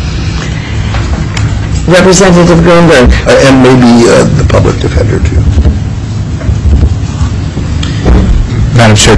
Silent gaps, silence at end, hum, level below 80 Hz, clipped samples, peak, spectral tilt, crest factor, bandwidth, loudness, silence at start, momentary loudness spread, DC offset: none; 0 s; none; -12 dBFS; 2%; 0 dBFS; -5.5 dB/octave; 6 dB; 11 kHz; -6 LUFS; 0 s; 11 LU; under 0.1%